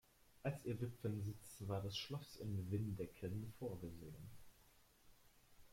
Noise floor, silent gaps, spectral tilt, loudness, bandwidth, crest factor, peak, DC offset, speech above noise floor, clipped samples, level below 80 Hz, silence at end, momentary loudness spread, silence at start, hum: -71 dBFS; none; -6.5 dB/octave; -48 LUFS; 16.5 kHz; 18 dB; -30 dBFS; under 0.1%; 24 dB; under 0.1%; -68 dBFS; 0 s; 11 LU; 0.3 s; none